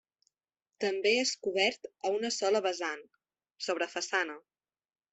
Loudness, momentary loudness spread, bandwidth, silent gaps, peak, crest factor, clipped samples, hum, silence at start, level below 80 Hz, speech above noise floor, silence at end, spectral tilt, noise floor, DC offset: -31 LUFS; 10 LU; 8.4 kHz; none; -14 dBFS; 20 dB; under 0.1%; none; 0.8 s; -82 dBFS; 57 dB; 0.75 s; -1.5 dB/octave; -89 dBFS; under 0.1%